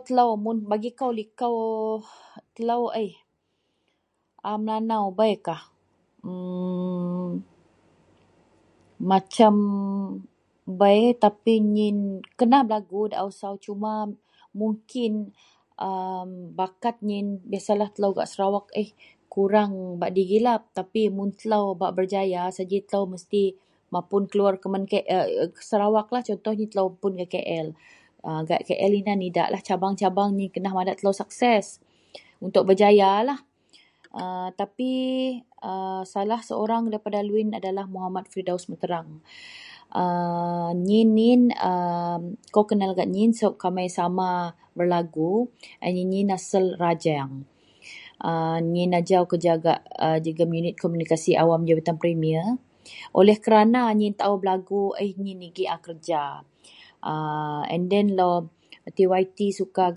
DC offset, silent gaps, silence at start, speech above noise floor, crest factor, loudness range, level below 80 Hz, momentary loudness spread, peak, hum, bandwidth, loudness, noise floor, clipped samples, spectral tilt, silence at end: under 0.1%; none; 0.05 s; 50 dB; 22 dB; 8 LU; -72 dBFS; 14 LU; -2 dBFS; none; 11 kHz; -24 LUFS; -74 dBFS; under 0.1%; -6.5 dB/octave; 0 s